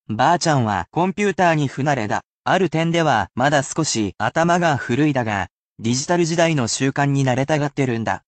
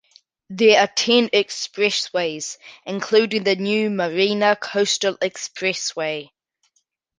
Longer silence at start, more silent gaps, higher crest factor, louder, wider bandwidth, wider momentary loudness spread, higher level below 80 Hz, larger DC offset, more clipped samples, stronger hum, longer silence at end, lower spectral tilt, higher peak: second, 0.1 s vs 0.5 s; first, 2.25-2.43 s, 5.50-5.76 s vs none; second, 14 dB vs 20 dB; about the same, -19 LUFS vs -20 LUFS; second, 9 kHz vs 10 kHz; second, 5 LU vs 13 LU; first, -56 dBFS vs -70 dBFS; neither; neither; neither; second, 0.1 s vs 0.95 s; first, -5 dB/octave vs -3 dB/octave; about the same, -4 dBFS vs -2 dBFS